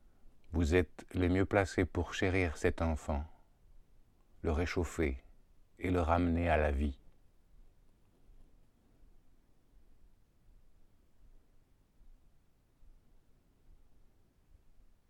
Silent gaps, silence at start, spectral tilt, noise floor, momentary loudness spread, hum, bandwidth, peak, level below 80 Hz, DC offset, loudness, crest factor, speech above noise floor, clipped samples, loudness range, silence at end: none; 0.25 s; -7 dB/octave; -67 dBFS; 10 LU; none; 12.5 kHz; -14 dBFS; -46 dBFS; under 0.1%; -34 LUFS; 22 dB; 34 dB; under 0.1%; 6 LU; 1.4 s